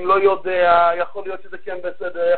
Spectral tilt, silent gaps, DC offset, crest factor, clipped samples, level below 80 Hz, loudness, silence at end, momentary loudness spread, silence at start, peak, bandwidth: -9 dB/octave; none; 3%; 16 dB; under 0.1%; -56 dBFS; -18 LUFS; 0 s; 17 LU; 0 s; -2 dBFS; 4.5 kHz